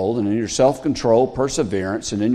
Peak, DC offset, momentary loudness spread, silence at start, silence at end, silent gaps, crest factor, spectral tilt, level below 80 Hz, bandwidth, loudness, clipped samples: -2 dBFS; under 0.1%; 5 LU; 0 s; 0 s; none; 16 dB; -5.5 dB/octave; -44 dBFS; 13 kHz; -19 LUFS; under 0.1%